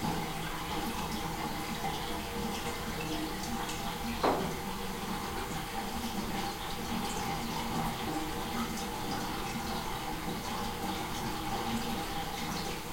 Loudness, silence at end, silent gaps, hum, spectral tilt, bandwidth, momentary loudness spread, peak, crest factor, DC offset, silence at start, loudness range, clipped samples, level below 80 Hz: -36 LUFS; 0 s; none; none; -4 dB/octave; 16.5 kHz; 3 LU; -16 dBFS; 20 dB; under 0.1%; 0 s; 1 LU; under 0.1%; -46 dBFS